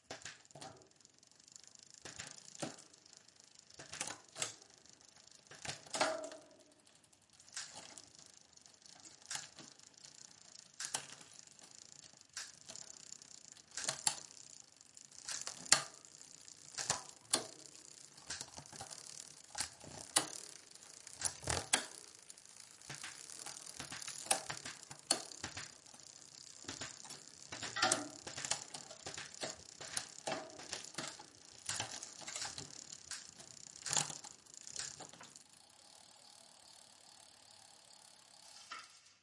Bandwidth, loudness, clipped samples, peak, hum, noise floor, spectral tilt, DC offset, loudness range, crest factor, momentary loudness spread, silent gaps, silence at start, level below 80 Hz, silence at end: 11.5 kHz; -42 LUFS; under 0.1%; -8 dBFS; none; -68 dBFS; -0.5 dB/octave; under 0.1%; 13 LU; 40 dB; 22 LU; none; 0.1 s; -78 dBFS; 0.05 s